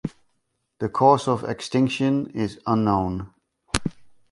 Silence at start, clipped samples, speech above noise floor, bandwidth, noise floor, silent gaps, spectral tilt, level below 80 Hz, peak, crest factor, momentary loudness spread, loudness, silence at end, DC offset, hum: 0.05 s; under 0.1%; 52 dB; 11.5 kHz; -73 dBFS; none; -6 dB/octave; -46 dBFS; -2 dBFS; 22 dB; 15 LU; -23 LUFS; 0.25 s; under 0.1%; none